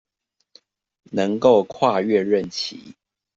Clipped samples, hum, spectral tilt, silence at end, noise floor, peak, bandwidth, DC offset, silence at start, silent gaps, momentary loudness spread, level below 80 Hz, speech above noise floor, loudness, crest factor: under 0.1%; none; -5.5 dB/octave; 0.45 s; -75 dBFS; -2 dBFS; 7.8 kHz; under 0.1%; 1.1 s; none; 13 LU; -62 dBFS; 55 dB; -20 LUFS; 20 dB